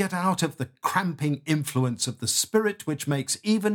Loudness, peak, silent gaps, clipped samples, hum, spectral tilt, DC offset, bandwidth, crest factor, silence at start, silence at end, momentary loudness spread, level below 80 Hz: -26 LUFS; -10 dBFS; none; under 0.1%; none; -4 dB/octave; under 0.1%; 19 kHz; 16 dB; 0 s; 0 s; 5 LU; -70 dBFS